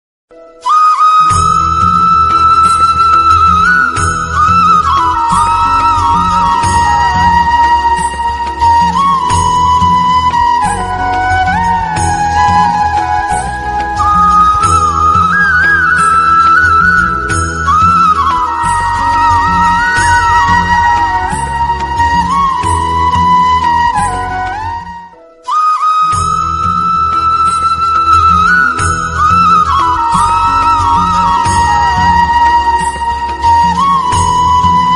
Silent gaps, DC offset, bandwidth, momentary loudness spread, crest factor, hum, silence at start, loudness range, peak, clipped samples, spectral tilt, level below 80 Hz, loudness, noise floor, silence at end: none; under 0.1%; 11.5 kHz; 7 LU; 10 dB; none; 0.65 s; 4 LU; 0 dBFS; under 0.1%; -3.5 dB/octave; -28 dBFS; -9 LUFS; -33 dBFS; 0 s